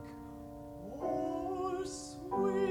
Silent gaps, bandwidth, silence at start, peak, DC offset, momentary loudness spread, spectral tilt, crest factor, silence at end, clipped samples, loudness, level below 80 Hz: none; 16.5 kHz; 0 s; -22 dBFS; under 0.1%; 14 LU; -5.5 dB/octave; 14 dB; 0 s; under 0.1%; -37 LUFS; -60 dBFS